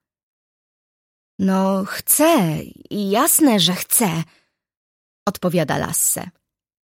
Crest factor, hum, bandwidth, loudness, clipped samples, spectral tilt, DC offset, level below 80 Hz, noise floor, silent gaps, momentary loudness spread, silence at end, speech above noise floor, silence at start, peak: 18 dB; none; 16.5 kHz; -18 LUFS; under 0.1%; -3.5 dB/octave; under 0.1%; -56 dBFS; under -90 dBFS; 4.77-5.26 s; 14 LU; 0.6 s; over 72 dB; 1.4 s; -2 dBFS